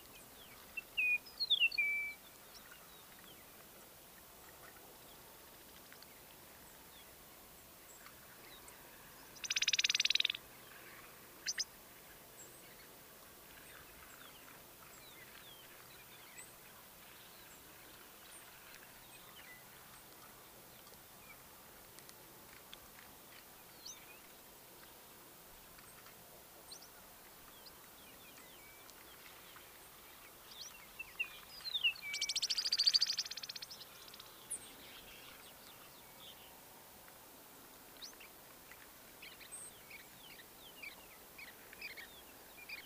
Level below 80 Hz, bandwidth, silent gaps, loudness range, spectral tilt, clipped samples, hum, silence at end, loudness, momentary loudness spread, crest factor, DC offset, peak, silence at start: -74 dBFS; 16 kHz; none; 19 LU; 1 dB/octave; under 0.1%; none; 0 s; -37 LUFS; 21 LU; 30 dB; under 0.1%; -16 dBFS; 0 s